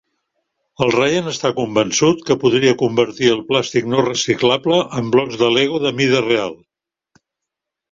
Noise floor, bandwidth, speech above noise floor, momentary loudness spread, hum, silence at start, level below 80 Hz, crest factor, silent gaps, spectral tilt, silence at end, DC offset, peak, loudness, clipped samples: -82 dBFS; 7.8 kHz; 66 dB; 4 LU; none; 0.8 s; -56 dBFS; 16 dB; none; -4.5 dB/octave; 1.35 s; under 0.1%; -2 dBFS; -16 LUFS; under 0.1%